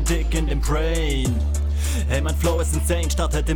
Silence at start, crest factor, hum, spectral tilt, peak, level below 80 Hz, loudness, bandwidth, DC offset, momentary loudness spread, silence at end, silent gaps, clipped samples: 0 s; 12 dB; none; -5 dB/octave; -8 dBFS; -22 dBFS; -22 LUFS; 19 kHz; under 0.1%; 2 LU; 0 s; none; under 0.1%